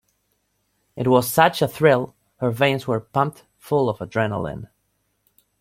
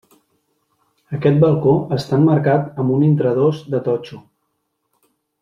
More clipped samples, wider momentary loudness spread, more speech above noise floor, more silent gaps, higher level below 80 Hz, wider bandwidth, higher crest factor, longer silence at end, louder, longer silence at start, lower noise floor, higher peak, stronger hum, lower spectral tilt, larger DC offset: neither; about the same, 10 LU vs 9 LU; second, 50 dB vs 56 dB; neither; about the same, -56 dBFS vs -56 dBFS; first, 16.5 kHz vs 7.2 kHz; about the same, 20 dB vs 16 dB; second, 0.95 s vs 1.2 s; second, -21 LUFS vs -17 LUFS; second, 0.95 s vs 1.1 s; about the same, -70 dBFS vs -72 dBFS; about the same, -2 dBFS vs -2 dBFS; first, 50 Hz at -55 dBFS vs none; second, -5.5 dB/octave vs -9.5 dB/octave; neither